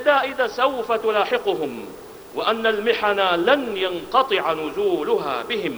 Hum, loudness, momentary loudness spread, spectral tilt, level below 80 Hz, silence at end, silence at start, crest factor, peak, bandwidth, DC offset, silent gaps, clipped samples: none; -21 LUFS; 7 LU; -4 dB/octave; -58 dBFS; 0 s; 0 s; 18 dB; -4 dBFS; over 20 kHz; under 0.1%; none; under 0.1%